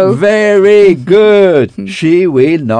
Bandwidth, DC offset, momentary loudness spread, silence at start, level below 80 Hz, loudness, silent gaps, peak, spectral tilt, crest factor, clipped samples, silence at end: 9.8 kHz; under 0.1%; 6 LU; 0 s; -48 dBFS; -8 LUFS; none; 0 dBFS; -7 dB/octave; 8 dB; 2%; 0 s